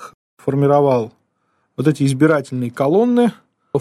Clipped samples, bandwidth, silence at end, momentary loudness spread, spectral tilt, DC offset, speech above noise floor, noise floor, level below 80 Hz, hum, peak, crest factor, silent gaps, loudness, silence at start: under 0.1%; 13.5 kHz; 0 s; 11 LU; -7.5 dB/octave; under 0.1%; 51 dB; -66 dBFS; -60 dBFS; none; -2 dBFS; 16 dB; 0.14-0.37 s; -17 LUFS; 0 s